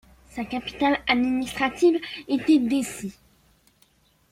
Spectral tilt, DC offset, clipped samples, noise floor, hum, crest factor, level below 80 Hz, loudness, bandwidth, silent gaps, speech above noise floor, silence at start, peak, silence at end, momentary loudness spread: -4 dB/octave; under 0.1%; under 0.1%; -62 dBFS; none; 18 dB; -54 dBFS; -23 LUFS; 15.5 kHz; none; 39 dB; 0.35 s; -8 dBFS; 1.2 s; 15 LU